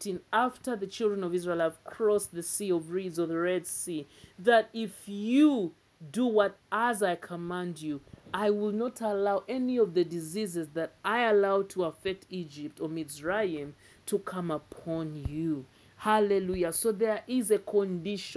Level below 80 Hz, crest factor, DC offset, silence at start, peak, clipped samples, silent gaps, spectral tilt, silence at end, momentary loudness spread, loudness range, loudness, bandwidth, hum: -60 dBFS; 20 dB; under 0.1%; 0 s; -10 dBFS; under 0.1%; none; -5 dB/octave; 0 s; 12 LU; 6 LU; -30 LUFS; 11 kHz; none